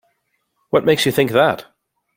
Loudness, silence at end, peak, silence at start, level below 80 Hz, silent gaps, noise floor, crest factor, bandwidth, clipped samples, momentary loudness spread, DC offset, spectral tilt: -16 LUFS; 0.55 s; -2 dBFS; 0.75 s; -56 dBFS; none; -69 dBFS; 18 dB; 16.5 kHz; under 0.1%; 5 LU; under 0.1%; -4.5 dB/octave